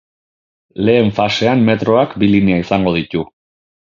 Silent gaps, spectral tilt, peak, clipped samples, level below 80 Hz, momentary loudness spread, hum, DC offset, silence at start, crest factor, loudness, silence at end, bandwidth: none; -7 dB/octave; 0 dBFS; under 0.1%; -42 dBFS; 10 LU; none; under 0.1%; 0.75 s; 16 dB; -14 LUFS; 0.75 s; 7.4 kHz